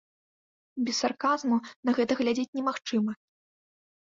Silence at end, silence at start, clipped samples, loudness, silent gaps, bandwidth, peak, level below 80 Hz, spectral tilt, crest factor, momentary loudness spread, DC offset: 1 s; 0.75 s; under 0.1%; -28 LUFS; 1.76-1.83 s, 2.48-2.53 s; 7.6 kHz; -14 dBFS; -72 dBFS; -4 dB/octave; 18 dB; 7 LU; under 0.1%